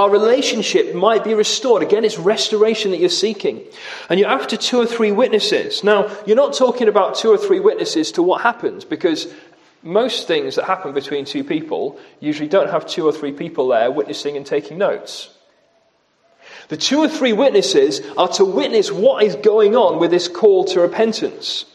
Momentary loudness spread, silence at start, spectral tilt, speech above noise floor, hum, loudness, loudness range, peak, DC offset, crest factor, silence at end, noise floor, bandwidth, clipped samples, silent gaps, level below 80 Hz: 10 LU; 0 s; -3.5 dB/octave; 43 dB; none; -16 LUFS; 6 LU; 0 dBFS; under 0.1%; 16 dB; 0.1 s; -59 dBFS; 12 kHz; under 0.1%; none; -72 dBFS